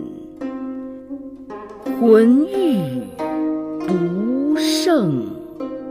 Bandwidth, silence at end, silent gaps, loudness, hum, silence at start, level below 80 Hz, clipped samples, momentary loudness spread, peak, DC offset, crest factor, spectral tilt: 15.5 kHz; 0 s; none; -18 LUFS; none; 0 s; -56 dBFS; under 0.1%; 20 LU; -2 dBFS; under 0.1%; 18 dB; -6 dB/octave